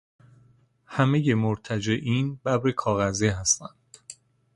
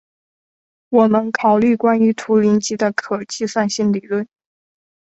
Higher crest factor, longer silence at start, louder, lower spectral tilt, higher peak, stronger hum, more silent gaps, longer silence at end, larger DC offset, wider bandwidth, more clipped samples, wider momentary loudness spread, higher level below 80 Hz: about the same, 20 dB vs 16 dB; about the same, 0.9 s vs 0.9 s; second, -25 LUFS vs -17 LUFS; about the same, -5 dB/octave vs -5.5 dB/octave; second, -8 dBFS vs -2 dBFS; neither; neither; second, 0.4 s vs 0.8 s; neither; first, 11.5 kHz vs 8.2 kHz; neither; first, 19 LU vs 9 LU; first, -52 dBFS vs -60 dBFS